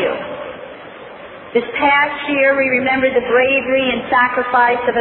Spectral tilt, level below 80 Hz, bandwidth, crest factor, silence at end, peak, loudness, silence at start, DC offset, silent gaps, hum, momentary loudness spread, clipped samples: -7.5 dB/octave; -52 dBFS; 4.2 kHz; 14 dB; 0 s; -2 dBFS; -15 LUFS; 0 s; under 0.1%; none; none; 20 LU; under 0.1%